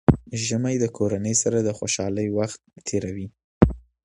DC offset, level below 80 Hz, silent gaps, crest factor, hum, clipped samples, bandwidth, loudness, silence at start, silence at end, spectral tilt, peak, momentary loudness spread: under 0.1%; -38 dBFS; 3.44-3.61 s; 24 dB; none; under 0.1%; 11.5 kHz; -24 LUFS; 0.1 s; 0.25 s; -5 dB/octave; 0 dBFS; 10 LU